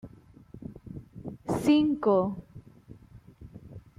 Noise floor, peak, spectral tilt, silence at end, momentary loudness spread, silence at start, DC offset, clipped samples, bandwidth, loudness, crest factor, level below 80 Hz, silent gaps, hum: -52 dBFS; -12 dBFS; -7 dB/octave; 0.2 s; 25 LU; 0.05 s; under 0.1%; under 0.1%; 13.5 kHz; -26 LUFS; 18 dB; -58 dBFS; none; none